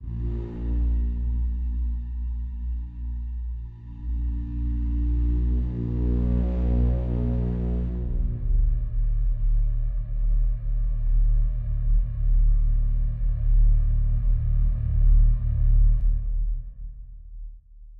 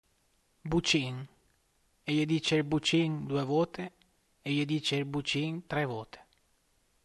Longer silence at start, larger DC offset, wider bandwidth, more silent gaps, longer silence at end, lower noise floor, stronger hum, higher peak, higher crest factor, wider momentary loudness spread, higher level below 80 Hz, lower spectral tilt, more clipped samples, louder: second, 0 s vs 0.65 s; neither; second, 1.9 kHz vs 12 kHz; neither; second, 0 s vs 0.8 s; second, -44 dBFS vs -72 dBFS; neither; first, -10 dBFS vs -14 dBFS; second, 12 dB vs 18 dB; second, 10 LU vs 15 LU; first, -22 dBFS vs -60 dBFS; first, -12 dB/octave vs -5 dB/octave; neither; first, -27 LUFS vs -31 LUFS